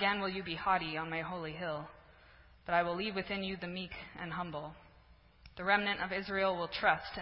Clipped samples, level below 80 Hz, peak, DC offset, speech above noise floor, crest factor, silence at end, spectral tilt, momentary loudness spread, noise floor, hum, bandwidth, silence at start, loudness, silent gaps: under 0.1%; -62 dBFS; -14 dBFS; under 0.1%; 26 dB; 24 dB; 0 s; -2 dB/octave; 13 LU; -62 dBFS; none; 5.6 kHz; 0 s; -35 LUFS; none